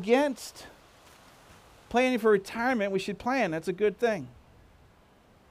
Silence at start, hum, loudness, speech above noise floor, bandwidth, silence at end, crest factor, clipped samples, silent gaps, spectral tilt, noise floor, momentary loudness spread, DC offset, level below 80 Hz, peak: 0 s; none; -28 LUFS; 32 dB; 15.5 kHz; 1.2 s; 20 dB; under 0.1%; none; -5 dB/octave; -59 dBFS; 17 LU; under 0.1%; -62 dBFS; -10 dBFS